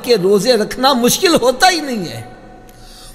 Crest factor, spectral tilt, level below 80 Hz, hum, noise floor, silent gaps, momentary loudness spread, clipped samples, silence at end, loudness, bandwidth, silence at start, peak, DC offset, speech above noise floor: 14 dB; -3 dB/octave; -42 dBFS; none; -38 dBFS; none; 12 LU; under 0.1%; 0 s; -13 LUFS; 16.5 kHz; 0 s; 0 dBFS; under 0.1%; 24 dB